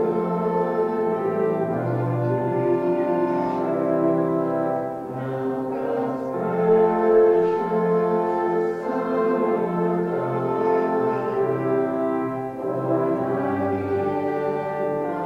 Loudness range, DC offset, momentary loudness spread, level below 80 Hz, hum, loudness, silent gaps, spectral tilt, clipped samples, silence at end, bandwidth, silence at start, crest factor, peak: 3 LU; under 0.1%; 7 LU; -62 dBFS; none; -23 LUFS; none; -9.5 dB/octave; under 0.1%; 0 s; 6 kHz; 0 s; 14 dB; -8 dBFS